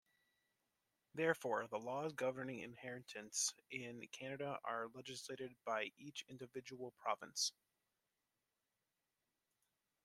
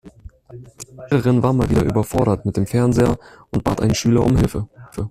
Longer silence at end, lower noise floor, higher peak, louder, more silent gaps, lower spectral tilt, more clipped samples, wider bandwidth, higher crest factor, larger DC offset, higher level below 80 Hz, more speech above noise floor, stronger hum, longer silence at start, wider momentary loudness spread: first, 2.55 s vs 0 s; first, under -90 dBFS vs -41 dBFS; second, -22 dBFS vs -2 dBFS; second, -45 LUFS vs -18 LUFS; neither; second, -2.5 dB/octave vs -7 dB/octave; neither; about the same, 15.5 kHz vs 15 kHz; first, 26 dB vs 16 dB; neither; second, -88 dBFS vs -34 dBFS; first, over 45 dB vs 24 dB; neither; first, 1.15 s vs 0.05 s; second, 11 LU vs 14 LU